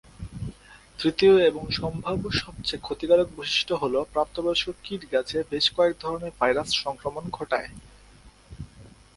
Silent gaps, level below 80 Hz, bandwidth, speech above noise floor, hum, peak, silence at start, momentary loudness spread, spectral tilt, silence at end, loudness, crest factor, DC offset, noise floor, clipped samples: none; -48 dBFS; 11.5 kHz; 27 dB; none; -8 dBFS; 0.2 s; 17 LU; -4.5 dB/octave; 0.25 s; -25 LUFS; 20 dB; under 0.1%; -52 dBFS; under 0.1%